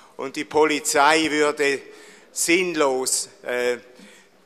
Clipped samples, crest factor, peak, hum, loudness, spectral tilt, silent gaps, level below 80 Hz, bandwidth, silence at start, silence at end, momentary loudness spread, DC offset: under 0.1%; 20 dB; -2 dBFS; none; -21 LUFS; -2 dB/octave; none; -64 dBFS; 15 kHz; 0.2 s; 0.4 s; 13 LU; under 0.1%